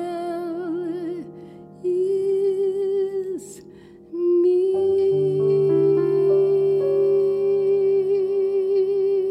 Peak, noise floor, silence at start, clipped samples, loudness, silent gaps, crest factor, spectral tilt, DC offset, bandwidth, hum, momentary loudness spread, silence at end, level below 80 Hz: -10 dBFS; -45 dBFS; 0 s; under 0.1%; -21 LUFS; none; 10 dB; -8.5 dB/octave; under 0.1%; 8.8 kHz; none; 12 LU; 0 s; -68 dBFS